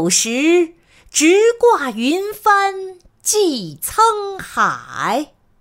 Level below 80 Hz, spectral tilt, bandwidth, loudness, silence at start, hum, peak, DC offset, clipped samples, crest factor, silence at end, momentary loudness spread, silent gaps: -54 dBFS; -2.5 dB/octave; 16.5 kHz; -16 LUFS; 0 s; none; -2 dBFS; under 0.1%; under 0.1%; 14 dB; 0.35 s; 11 LU; none